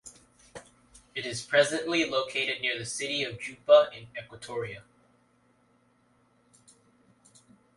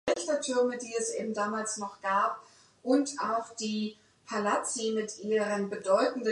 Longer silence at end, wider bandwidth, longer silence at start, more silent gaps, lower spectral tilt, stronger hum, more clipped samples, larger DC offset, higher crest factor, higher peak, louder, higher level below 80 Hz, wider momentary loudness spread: first, 2.95 s vs 0 s; about the same, 11.5 kHz vs 11.5 kHz; about the same, 0.05 s vs 0.05 s; neither; about the same, -3 dB/octave vs -3.5 dB/octave; neither; neither; neither; about the same, 22 dB vs 18 dB; first, -8 dBFS vs -14 dBFS; first, -27 LUFS vs -31 LUFS; first, -68 dBFS vs -76 dBFS; first, 27 LU vs 7 LU